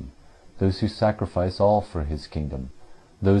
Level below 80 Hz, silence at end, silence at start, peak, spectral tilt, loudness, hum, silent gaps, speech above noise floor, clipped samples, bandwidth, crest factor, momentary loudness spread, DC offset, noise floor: -40 dBFS; 0 s; 0 s; -8 dBFS; -8.5 dB/octave; -25 LUFS; none; none; 23 dB; under 0.1%; 9.8 kHz; 16 dB; 13 LU; under 0.1%; -47 dBFS